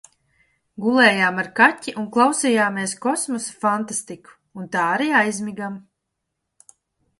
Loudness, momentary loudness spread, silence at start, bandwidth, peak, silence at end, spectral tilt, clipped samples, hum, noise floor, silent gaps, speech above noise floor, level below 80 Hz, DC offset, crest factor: -19 LUFS; 16 LU; 0.8 s; 11.5 kHz; 0 dBFS; 1.4 s; -3.5 dB/octave; under 0.1%; none; -78 dBFS; none; 58 dB; -68 dBFS; under 0.1%; 20 dB